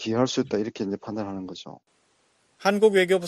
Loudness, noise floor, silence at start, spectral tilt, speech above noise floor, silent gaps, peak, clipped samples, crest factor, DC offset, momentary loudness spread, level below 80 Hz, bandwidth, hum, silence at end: -25 LUFS; -66 dBFS; 0 s; -5 dB/octave; 42 dB; none; -6 dBFS; under 0.1%; 18 dB; under 0.1%; 18 LU; -66 dBFS; 13 kHz; none; 0 s